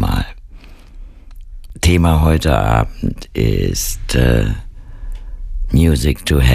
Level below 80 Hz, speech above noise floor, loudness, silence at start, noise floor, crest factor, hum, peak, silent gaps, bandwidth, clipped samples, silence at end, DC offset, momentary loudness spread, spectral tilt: -22 dBFS; 23 dB; -16 LUFS; 0 s; -36 dBFS; 14 dB; none; 0 dBFS; none; 15.5 kHz; under 0.1%; 0 s; under 0.1%; 19 LU; -5.5 dB/octave